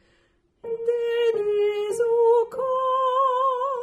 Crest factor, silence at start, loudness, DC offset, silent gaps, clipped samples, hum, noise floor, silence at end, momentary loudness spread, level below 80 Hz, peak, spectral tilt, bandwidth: 12 dB; 0.65 s; -22 LUFS; under 0.1%; none; under 0.1%; none; -65 dBFS; 0 s; 7 LU; -68 dBFS; -10 dBFS; -3 dB/octave; 12 kHz